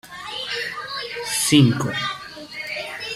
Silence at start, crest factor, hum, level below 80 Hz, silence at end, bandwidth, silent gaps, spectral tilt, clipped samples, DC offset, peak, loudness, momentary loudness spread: 0.05 s; 20 dB; none; -58 dBFS; 0 s; 16 kHz; none; -4 dB/octave; under 0.1%; under 0.1%; -2 dBFS; -22 LUFS; 16 LU